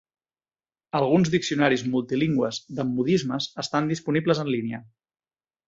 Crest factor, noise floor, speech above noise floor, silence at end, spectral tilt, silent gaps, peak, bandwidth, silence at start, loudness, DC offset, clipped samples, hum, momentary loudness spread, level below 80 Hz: 20 dB; under -90 dBFS; over 66 dB; 0.85 s; -6 dB/octave; none; -6 dBFS; 8 kHz; 0.95 s; -24 LUFS; under 0.1%; under 0.1%; none; 8 LU; -62 dBFS